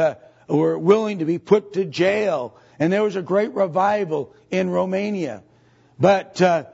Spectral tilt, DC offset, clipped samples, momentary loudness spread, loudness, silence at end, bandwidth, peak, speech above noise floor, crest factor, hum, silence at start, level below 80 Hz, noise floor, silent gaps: -6.5 dB/octave; under 0.1%; under 0.1%; 9 LU; -21 LUFS; 0.05 s; 8 kHz; -2 dBFS; 35 dB; 18 dB; none; 0 s; -66 dBFS; -55 dBFS; none